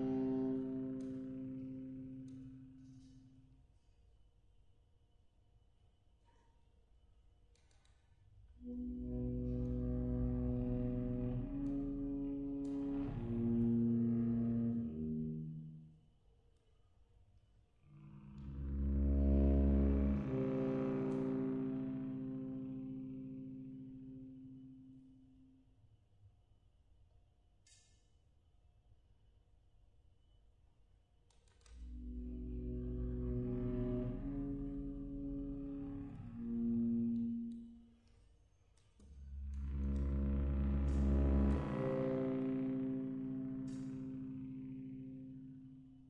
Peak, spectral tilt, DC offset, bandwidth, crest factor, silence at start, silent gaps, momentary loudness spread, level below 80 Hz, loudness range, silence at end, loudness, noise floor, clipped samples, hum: -24 dBFS; -10.5 dB/octave; under 0.1%; 4 kHz; 18 dB; 0 s; none; 18 LU; -46 dBFS; 16 LU; 0 s; -40 LUFS; -71 dBFS; under 0.1%; none